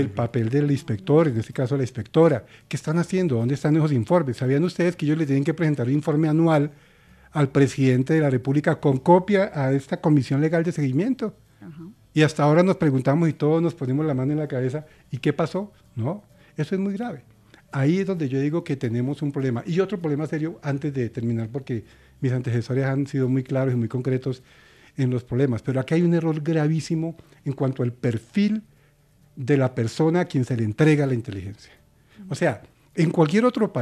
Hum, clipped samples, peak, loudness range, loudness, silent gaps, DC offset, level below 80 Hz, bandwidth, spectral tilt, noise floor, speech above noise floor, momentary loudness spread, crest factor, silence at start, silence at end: none; under 0.1%; -4 dBFS; 6 LU; -23 LUFS; none; under 0.1%; -60 dBFS; 11.5 kHz; -8 dB/octave; -58 dBFS; 36 dB; 12 LU; 20 dB; 0 s; 0 s